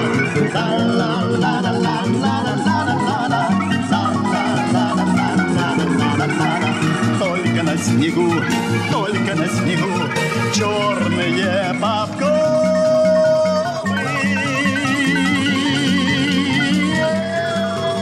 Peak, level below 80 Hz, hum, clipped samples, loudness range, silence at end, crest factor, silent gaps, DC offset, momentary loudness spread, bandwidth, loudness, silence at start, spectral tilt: -4 dBFS; -52 dBFS; none; under 0.1%; 2 LU; 0 s; 14 dB; none; under 0.1%; 3 LU; 14 kHz; -17 LUFS; 0 s; -5.5 dB/octave